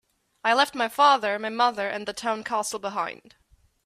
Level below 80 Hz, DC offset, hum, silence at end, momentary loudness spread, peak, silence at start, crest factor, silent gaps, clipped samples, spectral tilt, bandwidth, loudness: -68 dBFS; under 0.1%; none; 0.75 s; 11 LU; -6 dBFS; 0.45 s; 20 dB; none; under 0.1%; -2 dB/octave; 16 kHz; -24 LUFS